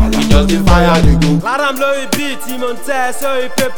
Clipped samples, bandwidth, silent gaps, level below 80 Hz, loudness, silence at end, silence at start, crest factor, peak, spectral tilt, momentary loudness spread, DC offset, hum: 0.9%; over 20 kHz; none; -20 dBFS; -13 LUFS; 0 s; 0 s; 12 dB; 0 dBFS; -5.5 dB/octave; 9 LU; under 0.1%; none